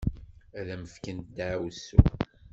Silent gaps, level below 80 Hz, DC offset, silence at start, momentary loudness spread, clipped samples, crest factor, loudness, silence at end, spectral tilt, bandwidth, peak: none; -34 dBFS; under 0.1%; 0 s; 17 LU; under 0.1%; 26 dB; -29 LUFS; 0.3 s; -7.5 dB/octave; 7.6 kHz; -2 dBFS